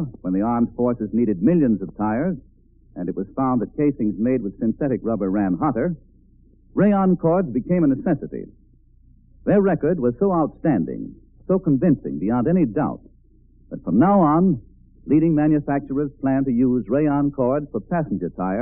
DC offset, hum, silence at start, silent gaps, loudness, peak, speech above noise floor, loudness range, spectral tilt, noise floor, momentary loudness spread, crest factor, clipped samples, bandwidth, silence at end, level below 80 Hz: under 0.1%; none; 0 s; none; -21 LUFS; -6 dBFS; 33 dB; 3 LU; -7 dB/octave; -52 dBFS; 11 LU; 16 dB; under 0.1%; 3.1 kHz; 0 s; -46 dBFS